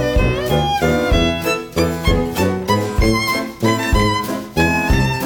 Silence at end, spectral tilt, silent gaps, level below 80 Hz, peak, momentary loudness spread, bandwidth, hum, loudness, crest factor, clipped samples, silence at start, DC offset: 0 s; -5.5 dB/octave; none; -24 dBFS; -2 dBFS; 4 LU; over 20 kHz; none; -17 LUFS; 14 dB; under 0.1%; 0 s; under 0.1%